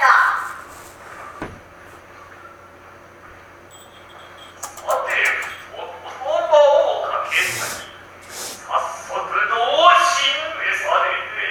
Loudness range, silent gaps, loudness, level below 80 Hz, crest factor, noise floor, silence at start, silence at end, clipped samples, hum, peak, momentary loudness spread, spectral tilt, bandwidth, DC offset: 21 LU; none; -18 LUFS; -58 dBFS; 20 dB; -43 dBFS; 0 s; 0 s; under 0.1%; none; 0 dBFS; 24 LU; -1 dB/octave; 19 kHz; under 0.1%